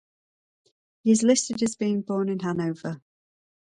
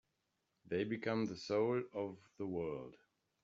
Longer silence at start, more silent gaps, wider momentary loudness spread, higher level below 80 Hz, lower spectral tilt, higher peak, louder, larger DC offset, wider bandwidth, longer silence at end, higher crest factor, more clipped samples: first, 1.05 s vs 0.65 s; neither; first, 14 LU vs 11 LU; first, -68 dBFS vs -76 dBFS; about the same, -5 dB/octave vs -5.5 dB/octave; first, -8 dBFS vs -22 dBFS; first, -25 LUFS vs -40 LUFS; neither; first, 11 kHz vs 7.6 kHz; first, 0.8 s vs 0.5 s; about the same, 20 dB vs 18 dB; neither